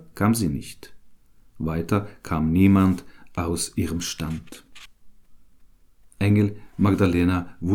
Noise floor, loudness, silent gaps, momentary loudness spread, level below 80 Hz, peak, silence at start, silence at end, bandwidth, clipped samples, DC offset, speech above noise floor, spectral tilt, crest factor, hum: -53 dBFS; -23 LUFS; none; 14 LU; -44 dBFS; -6 dBFS; 0 s; 0 s; 17 kHz; under 0.1%; under 0.1%; 31 dB; -6.5 dB/octave; 18 dB; none